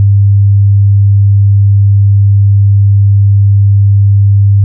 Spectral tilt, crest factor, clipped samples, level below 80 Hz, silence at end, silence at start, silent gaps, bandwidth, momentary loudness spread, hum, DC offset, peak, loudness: -31.5 dB/octave; 4 dB; under 0.1%; -38 dBFS; 0 s; 0 s; none; 0.2 kHz; 0 LU; none; under 0.1%; -2 dBFS; -7 LUFS